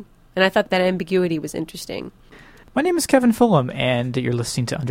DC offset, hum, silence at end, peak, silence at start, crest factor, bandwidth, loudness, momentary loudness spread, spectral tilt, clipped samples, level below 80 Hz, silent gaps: under 0.1%; none; 0 s; -2 dBFS; 0 s; 18 dB; 16.5 kHz; -20 LUFS; 14 LU; -5.5 dB/octave; under 0.1%; -50 dBFS; none